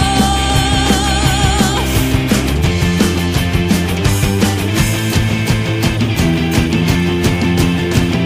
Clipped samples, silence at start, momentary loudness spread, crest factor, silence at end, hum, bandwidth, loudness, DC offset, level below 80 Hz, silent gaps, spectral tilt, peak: under 0.1%; 0 s; 2 LU; 14 dB; 0 s; none; 15.5 kHz; -14 LUFS; under 0.1%; -22 dBFS; none; -5 dB/octave; 0 dBFS